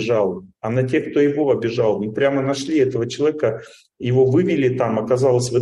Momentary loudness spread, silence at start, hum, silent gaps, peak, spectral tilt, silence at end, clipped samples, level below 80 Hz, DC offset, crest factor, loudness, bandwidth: 7 LU; 0 s; none; none; -6 dBFS; -6.5 dB/octave; 0 s; under 0.1%; -60 dBFS; under 0.1%; 14 dB; -19 LUFS; 11.5 kHz